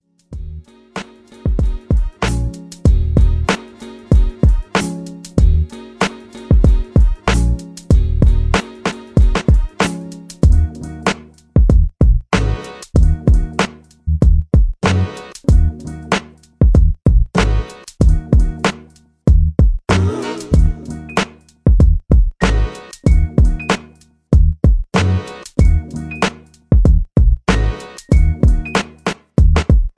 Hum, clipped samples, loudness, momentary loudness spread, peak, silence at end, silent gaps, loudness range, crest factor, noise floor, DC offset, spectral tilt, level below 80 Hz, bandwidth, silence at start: none; under 0.1%; -16 LUFS; 12 LU; 0 dBFS; 0.1 s; none; 2 LU; 14 dB; -45 dBFS; under 0.1%; -6.5 dB/octave; -16 dBFS; 11 kHz; 0.3 s